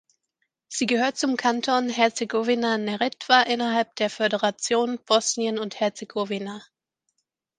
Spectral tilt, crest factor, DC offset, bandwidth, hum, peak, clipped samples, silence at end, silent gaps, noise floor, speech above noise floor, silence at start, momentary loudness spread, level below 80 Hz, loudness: -2.5 dB/octave; 22 dB; under 0.1%; 10 kHz; none; -2 dBFS; under 0.1%; 0.95 s; none; -77 dBFS; 54 dB; 0.7 s; 9 LU; -76 dBFS; -24 LUFS